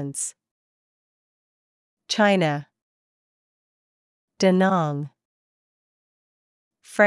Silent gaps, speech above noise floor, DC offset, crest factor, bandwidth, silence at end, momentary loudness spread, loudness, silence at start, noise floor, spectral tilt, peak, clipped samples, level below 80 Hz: 0.51-1.97 s, 2.82-4.28 s, 5.25-6.71 s; over 69 dB; under 0.1%; 20 dB; 12 kHz; 0 s; 14 LU; -22 LUFS; 0 s; under -90 dBFS; -5 dB/octave; -6 dBFS; under 0.1%; -78 dBFS